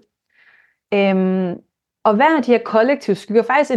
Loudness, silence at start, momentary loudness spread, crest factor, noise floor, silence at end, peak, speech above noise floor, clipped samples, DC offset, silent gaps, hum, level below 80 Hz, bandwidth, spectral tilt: -17 LUFS; 0.9 s; 8 LU; 16 dB; -56 dBFS; 0 s; -2 dBFS; 41 dB; under 0.1%; under 0.1%; none; none; -70 dBFS; 10 kHz; -7 dB/octave